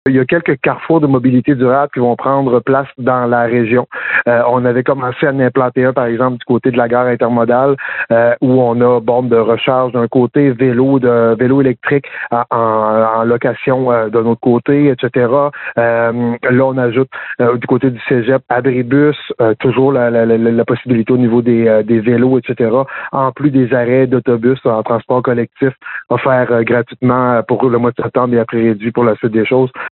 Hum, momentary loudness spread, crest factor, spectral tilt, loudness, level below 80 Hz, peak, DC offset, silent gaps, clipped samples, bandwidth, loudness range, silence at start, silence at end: none; 4 LU; 10 dB; -6.5 dB/octave; -12 LUFS; -54 dBFS; -2 dBFS; under 0.1%; none; under 0.1%; 4.2 kHz; 2 LU; 0.05 s; 0.1 s